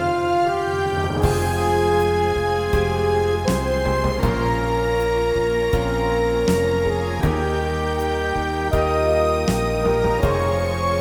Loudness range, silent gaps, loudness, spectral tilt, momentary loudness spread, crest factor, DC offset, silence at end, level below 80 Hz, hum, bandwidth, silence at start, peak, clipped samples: 1 LU; none; -20 LUFS; -6 dB/octave; 3 LU; 16 dB; 0.3%; 0 s; -30 dBFS; none; over 20 kHz; 0 s; -4 dBFS; under 0.1%